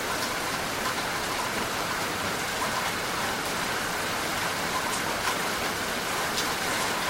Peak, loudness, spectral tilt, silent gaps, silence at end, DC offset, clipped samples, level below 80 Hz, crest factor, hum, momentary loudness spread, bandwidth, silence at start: -12 dBFS; -28 LUFS; -2 dB/octave; none; 0 s; under 0.1%; under 0.1%; -52 dBFS; 16 dB; none; 2 LU; 16 kHz; 0 s